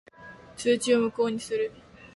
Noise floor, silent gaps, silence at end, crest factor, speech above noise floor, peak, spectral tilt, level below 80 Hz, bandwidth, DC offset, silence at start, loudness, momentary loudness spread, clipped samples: -48 dBFS; none; 0.1 s; 16 dB; 23 dB; -12 dBFS; -4 dB/octave; -64 dBFS; 11.5 kHz; under 0.1%; 0.2 s; -27 LUFS; 23 LU; under 0.1%